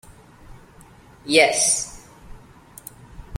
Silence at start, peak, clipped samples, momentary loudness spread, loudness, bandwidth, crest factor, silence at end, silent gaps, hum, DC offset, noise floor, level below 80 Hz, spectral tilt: 0.1 s; -2 dBFS; under 0.1%; 25 LU; -17 LUFS; 16.5 kHz; 24 dB; 0 s; none; none; under 0.1%; -48 dBFS; -48 dBFS; -1.5 dB/octave